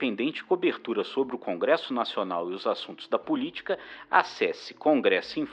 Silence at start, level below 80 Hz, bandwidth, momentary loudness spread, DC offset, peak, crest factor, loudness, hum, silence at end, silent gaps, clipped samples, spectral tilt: 0 s; -74 dBFS; 8.8 kHz; 8 LU; under 0.1%; -6 dBFS; 22 dB; -28 LUFS; none; 0 s; none; under 0.1%; -5 dB/octave